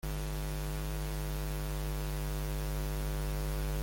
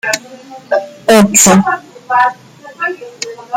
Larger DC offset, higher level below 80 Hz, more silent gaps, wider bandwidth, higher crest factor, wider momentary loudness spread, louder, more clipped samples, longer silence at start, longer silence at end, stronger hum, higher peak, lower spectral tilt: neither; first, -36 dBFS vs -50 dBFS; neither; second, 17 kHz vs over 20 kHz; about the same, 10 dB vs 14 dB; second, 1 LU vs 16 LU; second, -38 LUFS vs -11 LUFS; neither; about the same, 0.05 s vs 0.05 s; about the same, 0 s vs 0 s; neither; second, -24 dBFS vs 0 dBFS; first, -5.5 dB/octave vs -3.5 dB/octave